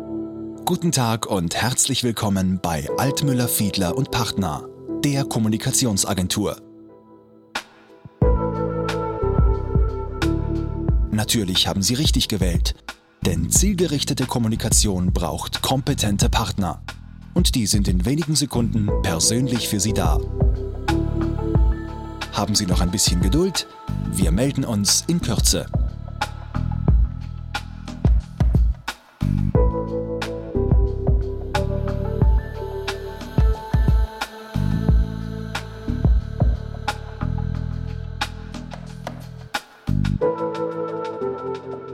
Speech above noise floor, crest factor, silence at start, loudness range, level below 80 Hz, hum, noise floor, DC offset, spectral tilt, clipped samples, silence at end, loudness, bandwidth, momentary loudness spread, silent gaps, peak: 28 dB; 16 dB; 0 s; 5 LU; -26 dBFS; none; -48 dBFS; under 0.1%; -4.5 dB/octave; under 0.1%; 0 s; -22 LUFS; 16.5 kHz; 12 LU; none; -4 dBFS